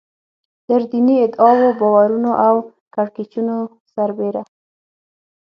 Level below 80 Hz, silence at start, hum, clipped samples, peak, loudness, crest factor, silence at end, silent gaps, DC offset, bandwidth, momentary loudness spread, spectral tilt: -70 dBFS; 0.7 s; none; under 0.1%; 0 dBFS; -16 LUFS; 16 dB; 1 s; 2.81-2.91 s, 3.80-3.85 s; under 0.1%; 5.6 kHz; 11 LU; -9.5 dB/octave